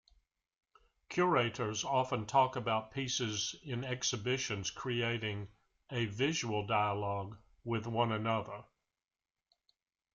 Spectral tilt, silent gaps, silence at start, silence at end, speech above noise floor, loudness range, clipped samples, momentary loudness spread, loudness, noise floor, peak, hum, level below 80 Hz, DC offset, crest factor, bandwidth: -4 dB/octave; none; 1.1 s; 1.55 s; over 55 dB; 3 LU; under 0.1%; 10 LU; -35 LUFS; under -90 dBFS; -16 dBFS; none; -68 dBFS; under 0.1%; 22 dB; 7.6 kHz